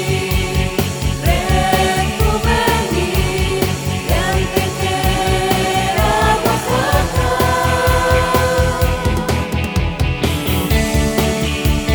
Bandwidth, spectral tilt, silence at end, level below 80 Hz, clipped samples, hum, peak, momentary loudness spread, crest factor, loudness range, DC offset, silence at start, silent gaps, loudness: over 20 kHz; -5 dB/octave; 0 s; -22 dBFS; under 0.1%; none; 0 dBFS; 4 LU; 14 dB; 2 LU; under 0.1%; 0 s; none; -16 LUFS